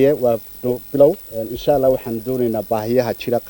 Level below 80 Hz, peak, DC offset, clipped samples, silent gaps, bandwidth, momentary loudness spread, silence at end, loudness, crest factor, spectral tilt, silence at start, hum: -46 dBFS; -2 dBFS; under 0.1%; under 0.1%; none; 18 kHz; 9 LU; 0 s; -19 LUFS; 16 dB; -7 dB/octave; 0 s; none